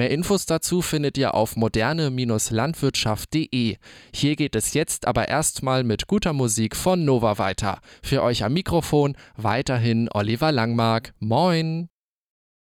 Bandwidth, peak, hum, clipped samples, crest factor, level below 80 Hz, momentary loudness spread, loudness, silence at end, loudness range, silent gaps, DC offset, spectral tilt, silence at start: 17.5 kHz; -8 dBFS; none; under 0.1%; 14 dB; -44 dBFS; 5 LU; -22 LUFS; 0.8 s; 1 LU; none; under 0.1%; -5 dB/octave; 0 s